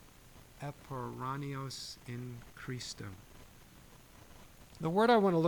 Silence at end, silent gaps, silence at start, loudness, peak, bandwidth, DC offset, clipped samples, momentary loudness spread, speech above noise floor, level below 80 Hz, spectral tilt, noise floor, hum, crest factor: 0 s; none; 0.25 s; -36 LUFS; -16 dBFS; 18 kHz; under 0.1%; under 0.1%; 28 LU; 23 dB; -62 dBFS; -6 dB/octave; -57 dBFS; none; 20 dB